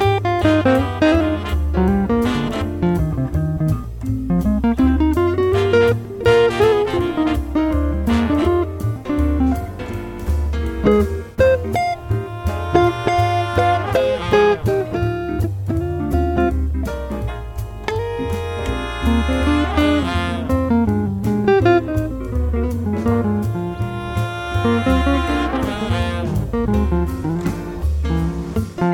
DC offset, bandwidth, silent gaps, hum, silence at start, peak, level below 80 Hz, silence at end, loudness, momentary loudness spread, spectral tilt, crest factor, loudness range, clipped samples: under 0.1%; 17 kHz; none; none; 0 s; -2 dBFS; -26 dBFS; 0 s; -19 LUFS; 8 LU; -7.5 dB/octave; 16 dB; 4 LU; under 0.1%